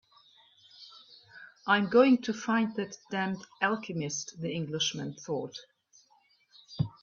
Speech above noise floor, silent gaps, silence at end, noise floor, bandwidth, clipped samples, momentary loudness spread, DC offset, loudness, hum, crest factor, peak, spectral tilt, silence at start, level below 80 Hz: 37 dB; none; 0.15 s; -67 dBFS; 7.4 kHz; under 0.1%; 26 LU; under 0.1%; -30 LUFS; none; 22 dB; -10 dBFS; -4.5 dB/octave; 0.8 s; -68 dBFS